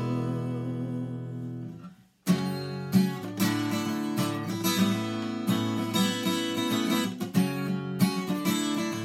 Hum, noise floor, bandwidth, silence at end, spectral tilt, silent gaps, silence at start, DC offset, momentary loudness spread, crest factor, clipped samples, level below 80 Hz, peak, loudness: none; -48 dBFS; 16.5 kHz; 0 s; -5 dB/octave; none; 0 s; under 0.1%; 9 LU; 18 dB; under 0.1%; -70 dBFS; -10 dBFS; -29 LUFS